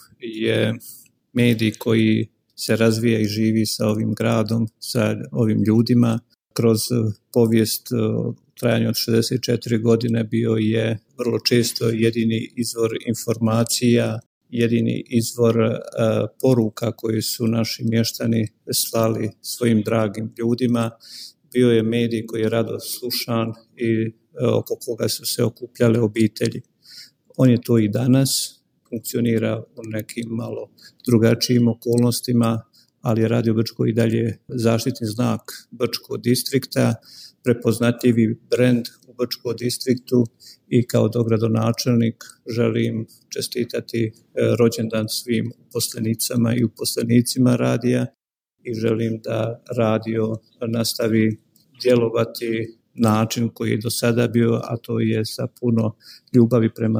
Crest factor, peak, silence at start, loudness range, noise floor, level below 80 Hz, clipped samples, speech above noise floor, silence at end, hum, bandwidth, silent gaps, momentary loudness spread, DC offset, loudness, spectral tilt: 18 dB; -2 dBFS; 0.2 s; 3 LU; -45 dBFS; -62 dBFS; under 0.1%; 25 dB; 0 s; none; 16 kHz; 14.26-14.41 s; 10 LU; under 0.1%; -21 LUFS; -5.5 dB/octave